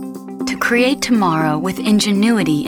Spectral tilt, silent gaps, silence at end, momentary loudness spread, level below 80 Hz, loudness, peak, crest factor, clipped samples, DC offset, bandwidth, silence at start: -4.5 dB/octave; none; 0 s; 8 LU; -52 dBFS; -16 LUFS; -2 dBFS; 14 dB; under 0.1%; under 0.1%; 18 kHz; 0 s